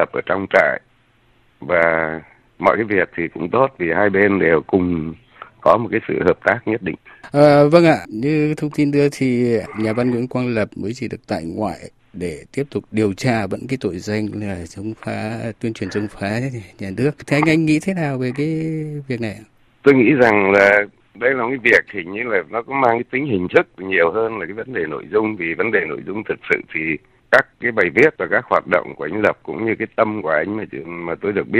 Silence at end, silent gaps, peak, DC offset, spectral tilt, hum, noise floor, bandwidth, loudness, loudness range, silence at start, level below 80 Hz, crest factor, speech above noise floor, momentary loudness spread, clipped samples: 0 s; none; 0 dBFS; under 0.1%; -7 dB/octave; none; -56 dBFS; 13 kHz; -18 LUFS; 8 LU; 0 s; -54 dBFS; 18 dB; 38 dB; 13 LU; under 0.1%